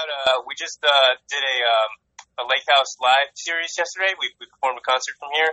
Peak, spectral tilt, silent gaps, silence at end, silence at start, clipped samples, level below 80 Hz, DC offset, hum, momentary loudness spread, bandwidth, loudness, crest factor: -4 dBFS; 2 dB/octave; none; 0 s; 0 s; under 0.1%; -74 dBFS; under 0.1%; none; 10 LU; 8.4 kHz; -20 LUFS; 18 dB